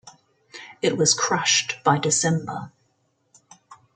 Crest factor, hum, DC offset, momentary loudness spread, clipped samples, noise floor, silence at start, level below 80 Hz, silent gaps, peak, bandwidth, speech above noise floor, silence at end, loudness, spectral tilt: 20 dB; none; under 0.1%; 21 LU; under 0.1%; -69 dBFS; 0.05 s; -66 dBFS; none; -4 dBFS; 11 kHz; 47 dB; 0.2 s; -20 LUFS; -2.5 dB/octave